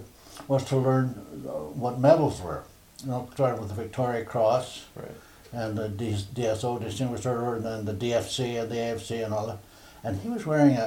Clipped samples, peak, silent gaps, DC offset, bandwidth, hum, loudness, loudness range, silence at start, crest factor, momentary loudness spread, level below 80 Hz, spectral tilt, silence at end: under 0.1%; -6 dBFS; none; under 0.1%; 16.5 kHz; none; -28 LUFS; 4 LU; 0 s; 22 dB; 17 LU; -56 dBFS; -6.5 dB/octave; 0 s